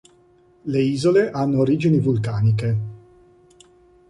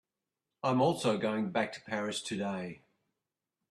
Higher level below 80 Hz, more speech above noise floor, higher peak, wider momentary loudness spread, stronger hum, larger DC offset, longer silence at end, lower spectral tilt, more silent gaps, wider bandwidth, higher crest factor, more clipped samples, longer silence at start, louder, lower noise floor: first, -52 dBFS vs -74 dBFS; second, 36 dB vs 57 dB; first, -6 dBFS vs -16 dBFS; about the same, 8 LU vs 8 LU; neither; neither; first, 1.15 s vs 0.95 s; first, -8 dB/octave vs -5 dB/octave; neither; second, 11 kHz vs 13 kHz; about the same, 16 dB vs 18 dB; neither; about the same, 0.65 s vs 0.65 s; first, -20 LUFS vs -33 LUFS; second, -55 dBFS vs -89 dBFS